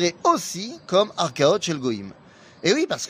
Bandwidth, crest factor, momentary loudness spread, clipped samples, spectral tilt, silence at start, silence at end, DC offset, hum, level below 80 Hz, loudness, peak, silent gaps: 15.5 kHz; 18 dB; 11 LU; under 0.1%; -4 dB/octave; 0 s; 0 s; under 0.1%; none; -66 dBFS; -22 LUFS; -4 dBFS; none